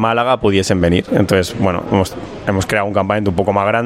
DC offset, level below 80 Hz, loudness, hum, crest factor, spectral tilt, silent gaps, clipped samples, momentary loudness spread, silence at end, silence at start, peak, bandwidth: under 0.1%; -42 dBFS; -16 LUFS; none; 14 dB; -6 dB/octave; none; under 0.1%; 4 LU; 0 s; 0 s; 0 dBFS; 16 kHz